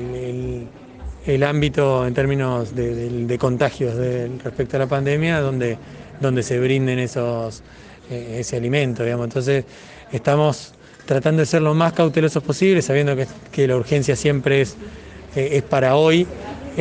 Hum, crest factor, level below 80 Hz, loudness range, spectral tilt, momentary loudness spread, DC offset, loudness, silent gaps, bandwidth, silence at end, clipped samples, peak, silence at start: none; 18 dB; -44 dBFS; 4 LU; -6.5 dB/octave; 15 LU; under 0.1%; -20 LUFS; none; 9.6 kHz; 0 s; under 0.1%; -2 dBFS; 0 s